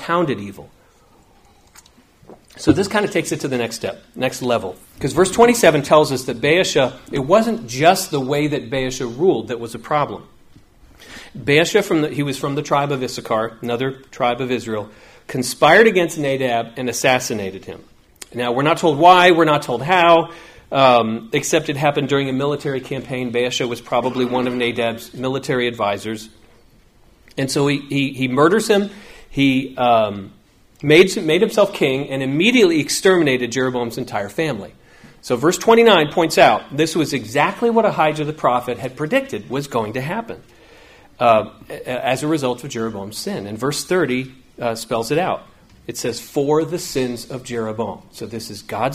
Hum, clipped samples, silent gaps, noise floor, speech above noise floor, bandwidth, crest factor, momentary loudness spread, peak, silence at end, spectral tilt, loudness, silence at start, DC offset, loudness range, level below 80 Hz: none; under 0.1%; none; -52 dBFS; 34 dB; 15.5 kHz; 18 dB; 14 LU; 0 dBFS; 0 s; -4.5 dB/octave; -18 LUFS; 0 s; under 0.1%; 7 LU; -50 dBFS